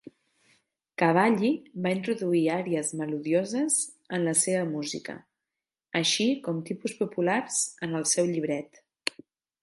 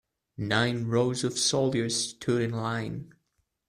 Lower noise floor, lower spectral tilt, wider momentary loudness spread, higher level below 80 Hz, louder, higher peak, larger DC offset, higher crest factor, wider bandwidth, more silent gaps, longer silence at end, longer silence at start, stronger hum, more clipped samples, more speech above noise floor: first, -89 dBFS vs -76 dBFS; about the same, -3.5 dB/octave vs -4 dB/octave; about the same, 10 LU vs 9 LU; second, -76 dBFS vs -62 dBFS; about the same, -27 LUFS vs -28 LUFS; about the same, -6 dBFS vs -8 dBFS; neither; about the same, 22 dB vs 20 dB; second, 12 kHz vs 14.5 kHz; neither; first, 1 s vs 0.6 s; first, 1 s vs 0.4 s; neither; neither; first, 62 dB vs 49 dB